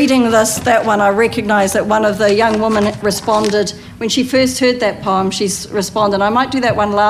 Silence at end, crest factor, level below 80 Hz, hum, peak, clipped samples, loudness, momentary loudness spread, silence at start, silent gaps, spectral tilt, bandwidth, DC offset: 0 s; 12 dB; -44 dBFS; none; -2 dBFS; under 0.1%; -14 LUFS; 5 LU; 0 s; none; -4 dB/octave; 16 kHz; under 0.1%